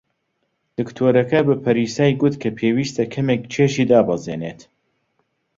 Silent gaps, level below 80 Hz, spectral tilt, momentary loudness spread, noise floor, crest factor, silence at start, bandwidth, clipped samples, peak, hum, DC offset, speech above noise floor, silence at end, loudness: none; -56 dBFS; -6.5 dB/octave; 13 LU; -71 dBFS; 18 dB; 0.8 s; 7.8 kHz; under 0.1%; -2 dBFS; none; under 0.1%; 53 dB; 1.05 s; -19 LUFS